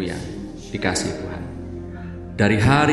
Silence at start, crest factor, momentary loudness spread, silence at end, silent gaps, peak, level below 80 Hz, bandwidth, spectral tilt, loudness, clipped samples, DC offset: 0 s; 20 dB; 17 LU; 0 s; none; -2 dBFS; -40 dBFS; 11.5 kHz; -5.5 dB/octave; -22 LUFS; under 0.1%; 0.1%